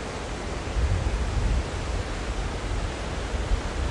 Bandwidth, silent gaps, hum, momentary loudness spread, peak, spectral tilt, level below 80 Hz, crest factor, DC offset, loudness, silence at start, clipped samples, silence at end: 11.5 kHz; none; none; 5 LU; -12 dBFS; -5 dB/octave; -30 dBFS; 14 dB; under 0.1%; -30 LUFS; 0 s; under 0.1%; 0 s